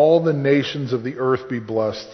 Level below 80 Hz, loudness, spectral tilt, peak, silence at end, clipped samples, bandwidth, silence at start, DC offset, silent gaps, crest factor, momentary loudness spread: -58 dBFS; -21 LUFS; -7 dB/octave; -4 dBFS; 0 s; under 0.1%; 6.4 kHz; 0 s; under 0.1%; none; 14 dB; 7 LU